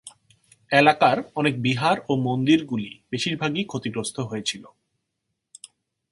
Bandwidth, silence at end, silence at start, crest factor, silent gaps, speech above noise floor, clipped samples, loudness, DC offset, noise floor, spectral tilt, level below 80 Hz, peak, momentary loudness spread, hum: 11.5 kHz; 1.45 s; 0.05 s; 24 dB; none; 57 dB; under 0.1%; -23 LUFS; under 0.1%; -79 dBFS; -5 dB/octave; -64 dBFS; 0 dBFS; 12 LU; none